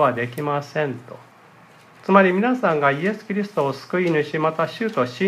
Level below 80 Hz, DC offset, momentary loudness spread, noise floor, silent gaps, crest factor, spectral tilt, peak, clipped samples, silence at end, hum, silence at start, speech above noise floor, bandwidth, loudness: -72 dBFS; under 0.1%; 9 LU; -49 dBFS; none; 22 dB; -7 dB/octave; 0 dBFS; under 0.1%; 0 s; none; 0 s; 28 dB; 15 kHz; -21 LUFS